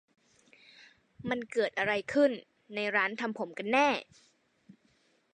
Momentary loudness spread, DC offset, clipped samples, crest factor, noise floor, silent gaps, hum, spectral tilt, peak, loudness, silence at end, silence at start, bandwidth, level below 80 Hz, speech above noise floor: 10 LU; under 0.1%; under 0.1%; 20 dB; -70 dBFS; none; none; -4.5 dB/octave; -14 dBFS; -30 LUFS; 1.3 s; 1.2 s; 9.8 kHz; -74 dBFS; 39 dB